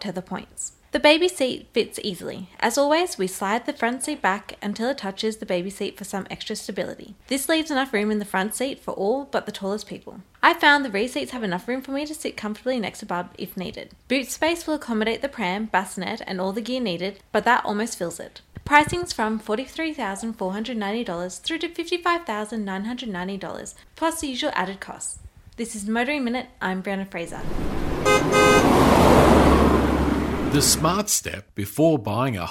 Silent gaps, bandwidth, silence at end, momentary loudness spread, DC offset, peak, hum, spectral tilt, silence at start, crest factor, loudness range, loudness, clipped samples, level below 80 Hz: none; 16 kHz; 0 s; 15 LU; under 0.1%; 0 dBFS; none; -4 dB/octave; 0 s; 24 dB; 10 LU; -23 LUFS; under 0.1%; -38 dBFS